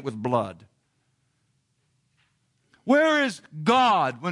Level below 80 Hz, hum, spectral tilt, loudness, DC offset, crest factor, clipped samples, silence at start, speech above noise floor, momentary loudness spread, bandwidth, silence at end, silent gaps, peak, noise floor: -74 dBFS; none; -5 dB/octave; -22 LUFS; under 0.1%; 18 dB; under 0.1%; 0 s; 48 dB; 10 LU; 11.5 kHz; 0 s; none; -8 dBFS; -71 dBFS